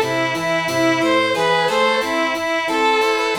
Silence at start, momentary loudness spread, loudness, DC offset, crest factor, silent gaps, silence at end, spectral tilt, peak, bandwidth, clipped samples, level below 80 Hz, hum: 0 s; 3 LU; -17 LUFS; under 0.1%; 12 dB; none; 0 s; -3.5 dB/octave; -6 dBFS; over 20 kHz; under 0.1%; -56 dBFS; none